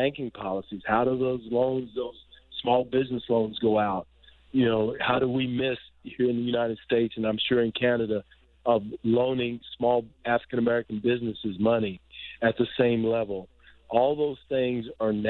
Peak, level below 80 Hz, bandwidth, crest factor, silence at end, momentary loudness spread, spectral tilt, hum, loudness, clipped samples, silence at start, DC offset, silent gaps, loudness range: -8 dBFS; -58 dBFS; 4.3 kHz; 18 dB; 0 s; 9 LU; -9.5 dB/octave; none; -27 LUFS; under 0.1%; 0 s; under 0.1%; none; 1 LU